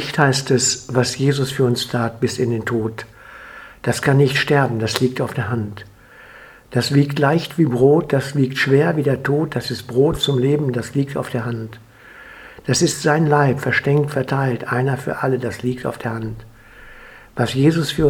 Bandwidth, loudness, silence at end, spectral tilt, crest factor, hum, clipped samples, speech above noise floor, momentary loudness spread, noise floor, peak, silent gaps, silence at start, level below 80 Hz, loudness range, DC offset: 16.5 kHz; -18 LUFS; 0 s; -5.5 dB/octave; 18 dB; none; under 0.1%; 25 dB; 14 LU; -43 dBFS; 0 dBFS; none; 0 s; -48 dBFS; 4 LU; under 0.1%